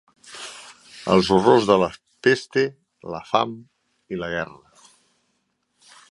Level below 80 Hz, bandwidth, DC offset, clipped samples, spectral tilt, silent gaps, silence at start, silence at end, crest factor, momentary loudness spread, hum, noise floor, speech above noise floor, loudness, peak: -56 dBFS; 11.5 kHz; under 0.1%; under 0.1%; -5.5 dB/octave; none; 0.3 s; 1.65 s; 22 dB; 24 LU; none; -72 dBFS; 52 dB; -21 LUFS; -2 dBFS